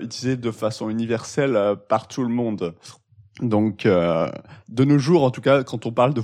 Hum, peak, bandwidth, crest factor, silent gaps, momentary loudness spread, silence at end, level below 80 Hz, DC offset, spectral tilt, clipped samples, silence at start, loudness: none; -4 dBFS; 11 kHz; 16 dB; none; 9 LU; 0 s; -60 dBFS; under 0.1%; -7 dB/octave; under 0.1%; 0 s; -21 LUFS